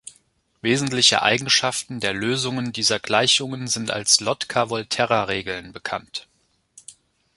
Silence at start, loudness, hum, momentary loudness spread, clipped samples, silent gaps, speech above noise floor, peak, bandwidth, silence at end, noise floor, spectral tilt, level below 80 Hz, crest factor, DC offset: 0.05 s; -20 LUFS; none; 14 LU; under 0.1%; none; 40 dB; 0 dBFS; 12 kHz; 0.45 s; -62 dBFS; -2 dB/octave; -58 dBFS; 22 dB; under 0.1%